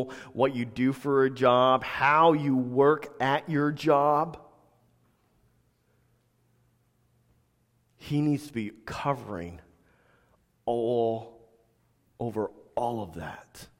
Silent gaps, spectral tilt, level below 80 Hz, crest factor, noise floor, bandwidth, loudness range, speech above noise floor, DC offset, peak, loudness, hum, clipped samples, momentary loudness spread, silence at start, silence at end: none; -7 dB/octave; -62 dBFS; 20 dB; -69 dBFS; 16 kHz; 12 LU; 43 dB; under 0.1%; -8 dBFS; -27 LUFS; none; under 0.1%; 16 LU; 0 s; 0.15 s